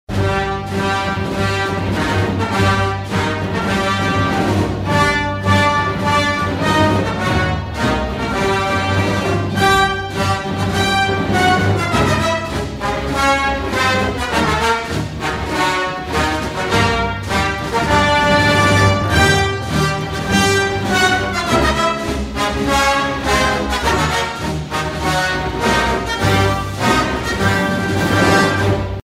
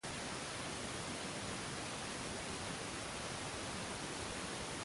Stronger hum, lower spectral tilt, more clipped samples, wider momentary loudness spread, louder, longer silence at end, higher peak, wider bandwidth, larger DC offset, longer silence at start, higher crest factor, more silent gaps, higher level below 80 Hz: neither; first, -4.5 dB/octave vs -3 dB/octave; neither; first, 6 LU vs 0 LU; first, -16 LUFS vs -43 LUFS; about the same, 0.05 s vs 0 s; first, 0 dBFS vs -30 dBFS; first, 16 kHz vs 11.5 kHz; neither; about the same, 0.1 s vs 0.05 s; about the same, 16 dB vs 14 dB; neither; first, -30 dBFS vs -60 dBFS